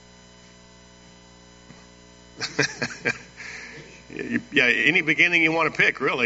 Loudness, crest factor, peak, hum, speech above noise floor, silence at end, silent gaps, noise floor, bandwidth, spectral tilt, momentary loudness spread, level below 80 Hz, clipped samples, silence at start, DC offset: -21 LUFS; 22 dB; -4 dBFS; 60 Hz at -50 dBFS; 28 dB; 0 s; none; -50 dBFS; 8 kHz; -1.5 dB/octave; 20 LU; -58 dBFS; under 0.1%; 2.35 s; under 0.1%